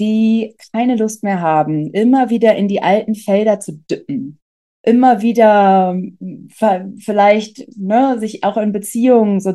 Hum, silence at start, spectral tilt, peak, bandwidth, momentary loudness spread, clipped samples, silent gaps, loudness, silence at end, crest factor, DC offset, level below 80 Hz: none; 0 s; -6.5 dB/octave; 0 dBFS; 12.5 kHz; 13 LU; under 0.1%; 4.42-4.84 s; -14 LUFS; 0 s; 14 dB; under 0.1%; -64 dBFS